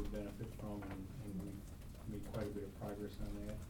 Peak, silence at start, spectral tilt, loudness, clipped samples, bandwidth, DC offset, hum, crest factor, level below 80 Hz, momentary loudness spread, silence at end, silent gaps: -32 dBFS; 0 s; -7 dB/octave; -48 LUFS; under 0.1%; 19 kHz; under 0.1%; none; 14 dB; -52 dBFS; 5 LU; 0 s; none